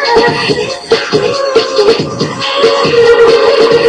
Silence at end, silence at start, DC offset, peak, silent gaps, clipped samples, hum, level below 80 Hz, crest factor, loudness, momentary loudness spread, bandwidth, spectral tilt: 0 s; 0 s; under 0.1%; 0 dBFS; none; 0.4%; none; -42 dBFS; 8 dB; -9 LUFS; 7 LU; 10.5 kHz; -4 dB/octave